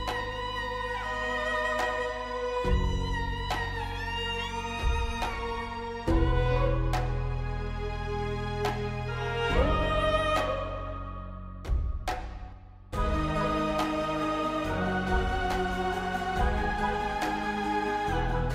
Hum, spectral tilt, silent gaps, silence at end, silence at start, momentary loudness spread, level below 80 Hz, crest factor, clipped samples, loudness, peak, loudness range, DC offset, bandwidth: none; -6 dB/octave; none; 0 s; 0 s; 8 LU; -34 dBFS; 18 dB; under 0.1%; -30 LUFS; -12 dBFS; 3 LU; under 0.1%; 15 kHz